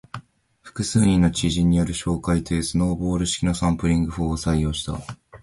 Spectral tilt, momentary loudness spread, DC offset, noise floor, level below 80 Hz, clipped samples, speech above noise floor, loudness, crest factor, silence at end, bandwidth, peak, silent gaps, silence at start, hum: -5.5 dB/octave; 13 LU; under 0.1%; -50 dBFS; -34 dBFS; under 0.1%; 29 dB; -22 LUFS; 16 dB; 0.05 s; 11.5 kHz; -6 dBFS; none; 0.15 s; none